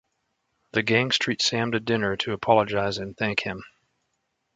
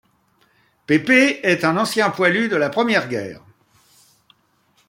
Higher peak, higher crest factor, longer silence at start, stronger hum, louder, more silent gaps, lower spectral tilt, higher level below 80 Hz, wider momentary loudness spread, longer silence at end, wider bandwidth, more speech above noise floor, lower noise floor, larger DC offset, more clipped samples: about the same, -4 dBFS vs -2 dBFS; about the same, 22 dB vs 20 dB; second, 0.75 s vs 0.9 s; neither; second, -24 LUFS vs -17 LUFS; neither; about the same, -4 dB/octave vs -4.5 dB/octave; first, -58 dBFS vs -64 dBFS; about the same, 8 LU vs 9 LU; second, 0.9 s vs 1.5 s; second, 9.4 kHz vs 16.5 kHz; first, 52 dB vs 44 dB; first, -76 dBFS vs -61 dBFS; neither; neither